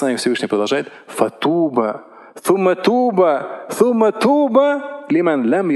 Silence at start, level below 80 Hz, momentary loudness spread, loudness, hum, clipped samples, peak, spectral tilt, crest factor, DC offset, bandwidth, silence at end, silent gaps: 0 s; -76 dBFS; 9 LU; -17 LUFS; none; under 0.1%; 0 dBFS; -5.5 dB/octave; 16 dB; under 0.1%; 12.5 kHz; 0 s; none